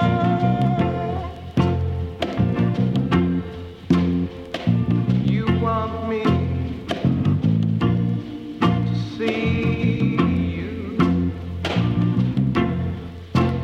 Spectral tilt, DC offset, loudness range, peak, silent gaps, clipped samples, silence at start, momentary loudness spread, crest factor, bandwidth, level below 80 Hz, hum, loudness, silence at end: -8.5 dB/octave; under 0.1%; 1 LU; -4 dBFS; none; under 0.1%; 0 s; 7 LU; 16 dB; 7.8 kHz; -38 dBFS; none; -22 LUFS; 0 s